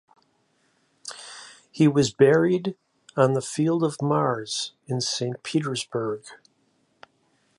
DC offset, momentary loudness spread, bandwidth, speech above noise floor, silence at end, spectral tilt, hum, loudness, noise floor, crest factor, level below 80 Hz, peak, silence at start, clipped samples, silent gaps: under 0.1%; 20 LU; 11.5 kHz; 44 dB; 1.25 s; -5.5 dB/octave; none; -24 LUFS; -67 dBFS; 20 dB; -68 dBFS; -4 dBFS; 1.05 s; under 0.1%; none